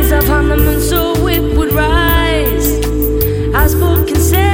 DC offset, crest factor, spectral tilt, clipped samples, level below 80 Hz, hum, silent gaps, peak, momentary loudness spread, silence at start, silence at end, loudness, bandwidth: under 0.1%; 10 dB; -5.5 dB/octave; under 0.1%; -16 dBFS; none; none; 0 dBFS; 3 LU; 0 s; 0 s; -12 LUFS; 17 kHz